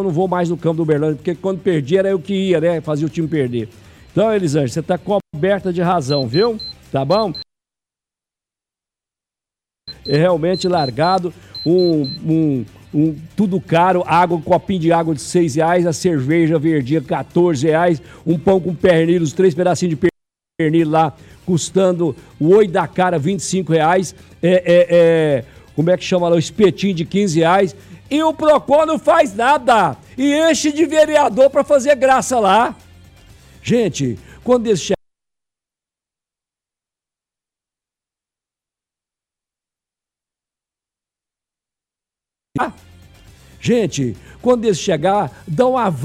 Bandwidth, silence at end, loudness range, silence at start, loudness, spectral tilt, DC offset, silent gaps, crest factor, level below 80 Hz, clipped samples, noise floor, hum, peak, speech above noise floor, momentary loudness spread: 14.5 kHz; 0 s; 9 LU; 0 s; -16 LUFS; -6 dB/octave; under 0.1%; none; 14 dB; -50 dBFS; under 0.1%; -89 dBFS; none; -4 dBFS; 74 dB; 9 LU